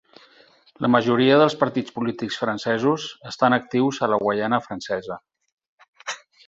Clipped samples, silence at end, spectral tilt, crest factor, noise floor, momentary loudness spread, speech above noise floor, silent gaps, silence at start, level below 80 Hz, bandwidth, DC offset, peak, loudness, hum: under 0.1%; 0.3 s; -5.5 dB/octave; 20 dB; -55 dBFS; 16 LU; 34 dB; 5.52-5.57 s, 5.68-5.78 s, 5.88-5.93 s; 0.8 s; -62 dBFS; 7.8 kHz; under 0.1%; -2 dBFS; -21 LUFS; none